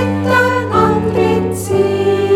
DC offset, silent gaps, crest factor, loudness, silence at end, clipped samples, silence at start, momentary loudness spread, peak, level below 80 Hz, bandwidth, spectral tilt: under 0.1%; none; 12 dB; -14 LUFS; 0 s; under 0.1%; 0 s; 3 LU; 0 dBFS; -40 dBFS; 15.5 kHz; -6 dB/octave